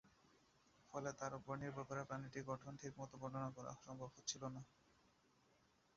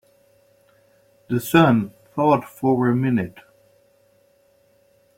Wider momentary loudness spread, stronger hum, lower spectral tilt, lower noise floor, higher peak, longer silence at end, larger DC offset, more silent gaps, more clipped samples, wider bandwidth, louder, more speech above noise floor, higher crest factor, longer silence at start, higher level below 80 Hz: second, 7 LU vs 11 LU; neither; second, -5 dB/octave vs -7 dB/octave; first, -77 dBFS vs -59 dBFS; second, -30 dBFS vs -2 dBFS; second, 1.25 s vs 1.85 s; neither; neither; neither; second, 7.4 kHz vs 16.5 kHz; second, -50 LUFS vs -20 LUFS; second, 27 dB vs 41 dB; about the same, 22 dB vs 20 dB; second, 0.05 s vs 1.3 s; second, -78 dBFS vs -60 dBFS